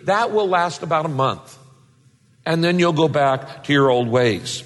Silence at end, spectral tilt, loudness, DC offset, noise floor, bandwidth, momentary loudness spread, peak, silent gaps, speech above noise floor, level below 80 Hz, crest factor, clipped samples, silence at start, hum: 0 s; -5.5 dB/octave; -19 LUFS; under 0.1%; -55 dBFS; 12 kHz; 7 LU; -6 dBFS; none; 36 dB; -60 dBFS; 14 dB; under 0.1%; 0.05 s; none